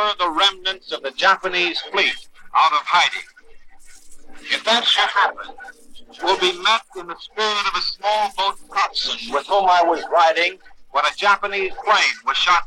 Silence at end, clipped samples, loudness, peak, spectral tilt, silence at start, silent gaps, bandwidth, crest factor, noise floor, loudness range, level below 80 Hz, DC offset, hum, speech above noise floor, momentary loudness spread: 0 s; under 0.1%; -18 LUFS; -4 dBFS; -0.5 dB/octave; 0 s; none; 13.5 kHz; 16 dB; -40 dBFS; 3 LU; -52 dBFS; under 0.1%; none; 21 dB; 10 LU